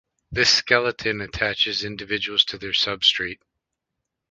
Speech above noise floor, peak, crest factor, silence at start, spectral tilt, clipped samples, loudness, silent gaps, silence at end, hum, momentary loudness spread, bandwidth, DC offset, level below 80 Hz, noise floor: 59 dB; -2 dBFS; 22 dB; 0.3 s; -2 dB/octave; under 0.1%; -20 LUFS; none; 0.95 s; none; 10 LU; 10 kHz; under 0.1%; -50 dBFS; -82 dBFS